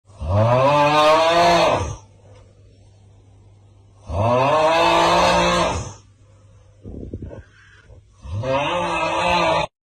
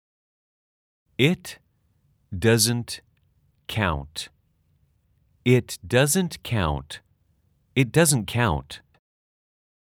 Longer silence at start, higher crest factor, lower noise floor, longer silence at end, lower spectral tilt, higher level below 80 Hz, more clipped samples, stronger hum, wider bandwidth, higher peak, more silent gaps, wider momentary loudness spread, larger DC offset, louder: second, 0.2 s vs 1.2 s; second, 12 dB vs 22 dB; second, -50 dBFS vs -66 dBFS; second, 0.25 s vs 1.05 s; about the same, -4.5 dB/octave vs -4.5 dB/octave; first, -40 dBFS vs -48 dBFS; neither; neither; second, 15 kHz vs 19.5 kHz; second, -8 dBFS vs -4 dBFS; neither; about the same, 20 LU vs 20 LU; neither; first, -17 LUFS vs -23 LUFS